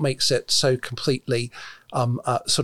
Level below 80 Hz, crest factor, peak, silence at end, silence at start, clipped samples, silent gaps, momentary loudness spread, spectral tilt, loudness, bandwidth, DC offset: -56 dBFS; 14 dB; -8 dBFS; 0 s; 0 s; under 0.1%; none; 10 LU; -4 dB/octave; -23 LUFS; 16 kHz; under 0.1%